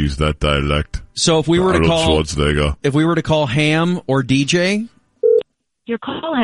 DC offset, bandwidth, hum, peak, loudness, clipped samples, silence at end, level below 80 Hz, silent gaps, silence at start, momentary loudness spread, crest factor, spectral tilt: under 0.1%; 11.5 kHz; none; -2 dBFS; -17 LUFS; under 0.1%; 0 s; -30 dBFS; none; 0 s; 9 LU; 14 dB; -5 dB/octave